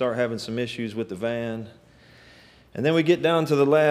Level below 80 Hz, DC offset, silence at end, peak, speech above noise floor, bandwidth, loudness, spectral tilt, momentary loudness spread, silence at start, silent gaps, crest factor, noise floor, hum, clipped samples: -62 dBFS; under 0.1%; 0 s; -6 dBFS; 29 dB; 14.5 kHz; -24 LUFS; -6.5 dB/octave; 13 LU; 0 s; none; 18 dB; -52 dBFS; none; under 0.1%